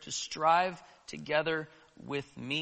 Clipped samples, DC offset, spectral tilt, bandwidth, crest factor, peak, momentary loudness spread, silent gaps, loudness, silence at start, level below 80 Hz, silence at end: under 0.1%; under 0.1%; -3 dB/octave; 8.4 kHz; 20 dB; -14 dBFS; 21 LU; none; -32 LUFS; 0 s; -70 dBFS; 0 s